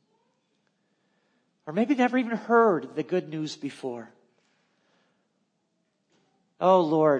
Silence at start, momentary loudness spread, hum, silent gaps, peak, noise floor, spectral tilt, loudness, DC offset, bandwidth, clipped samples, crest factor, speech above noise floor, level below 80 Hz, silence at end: 1.65 s; 15 LU; none; none; -8 dBFS; -75 dBFS; -6.5 dB/octave; -25 LUFS; under 0.1%; 9.8 kHz; under 0.1%; 20 dB; 51 dB; -88 dBFS; 0 s